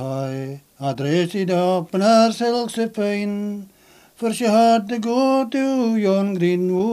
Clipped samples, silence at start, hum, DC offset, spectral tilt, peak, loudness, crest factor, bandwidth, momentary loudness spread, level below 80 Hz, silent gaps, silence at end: under 0.1%; 0 s; none; under 0.1%; -6 dB/octave; -4 dBFS; -20 LUFS; 14 dB; 15 kHz; 12 LU; -68 dBFS; none; 0 s